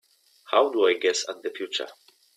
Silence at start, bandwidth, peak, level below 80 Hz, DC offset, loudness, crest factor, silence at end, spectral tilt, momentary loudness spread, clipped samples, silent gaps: 0.5 s; 13.5 kHz; -6 dBFS; -78 dBFS; under 0.1%; -25 LUFS; 20 dB; 0.45 s; -0.5 dB/octave; 11 LU; under 0.1%; none